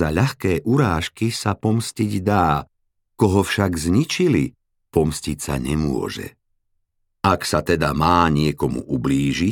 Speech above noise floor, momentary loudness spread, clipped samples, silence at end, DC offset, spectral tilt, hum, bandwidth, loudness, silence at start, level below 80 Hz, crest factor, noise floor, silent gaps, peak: 50 dB; 7 LU; under 0.1%; 0 s; under 0.1%; -6 dB/octave; none; 18.5 kHz; -20 LUFS; 0 s; -40 dBFS; 18 dB; -70 dBFS; none; -2 dBFS